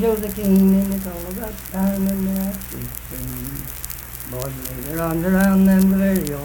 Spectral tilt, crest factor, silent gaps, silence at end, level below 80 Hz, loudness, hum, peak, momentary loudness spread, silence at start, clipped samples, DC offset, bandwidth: -6.5 dB/octave; 18 dB; none; 0 s; -36 dBFS; -20 LUFS; none; -2 dBFS; 14 LU; 0 s; under 0.1%; under 0.1%; 19.5 kHz